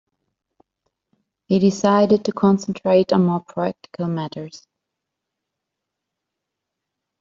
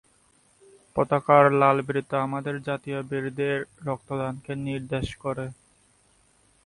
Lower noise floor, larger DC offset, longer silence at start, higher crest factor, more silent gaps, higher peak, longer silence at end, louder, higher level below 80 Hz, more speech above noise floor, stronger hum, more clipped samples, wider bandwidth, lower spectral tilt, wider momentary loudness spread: first, -82 dBFS vs -62 dBFS; neither; first, 1.5 s vs 0.95 s; about the same, 18 dB vs 22 dB; neither; about the same, -4 dBFS vs -4 dBFS; first, 2.65 s vs 1.15 s; first, -19 LUFS vs -25 LUFS; second, -62 dBFS vs -56 dBFS; first, 63 dB vs 38 dB; neither; neither; second, 7.6 kHz vs 11.5 kHz; about the same, -7 dB/octave vs -7 dB/octave; about the same, 12 LU vs 14 LU